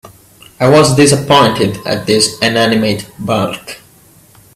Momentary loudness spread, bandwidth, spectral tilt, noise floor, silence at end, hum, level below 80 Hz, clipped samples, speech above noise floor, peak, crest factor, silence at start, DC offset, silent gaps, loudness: 12 LU; 15.5 kHz; -4.5 dB/octave; -44 dBFS; 0.8 s; none; -46 dBFS; under 0.1%; 33 dB; 0 dBFS; 12 dB; 0.05 s; under 0.1%; none; -11 LUFS